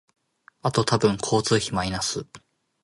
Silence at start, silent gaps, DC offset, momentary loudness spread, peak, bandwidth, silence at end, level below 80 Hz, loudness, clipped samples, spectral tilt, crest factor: 0.65 s; none; under 0.1%; 9 LU; -6 dBFS; 11.5 kHz; 0.45 s; -50 dBFS; -24 LUFS; under 0.1%; -4.5 dB/octave; 20 dB